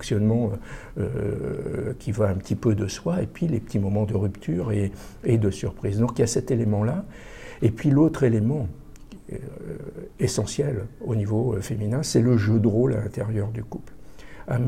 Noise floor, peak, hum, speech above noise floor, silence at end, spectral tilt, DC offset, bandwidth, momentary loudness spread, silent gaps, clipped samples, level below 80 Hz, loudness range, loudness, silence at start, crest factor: -44 dBFS; -6 dBFS; none; 20 dB; 0 s; -7 dB/octave; under 0.1%; 14 kHz; 16 LU; none; under 0.1%; -44 dBFS; 4 LU; -25 LUFS; 0 s; 18 dB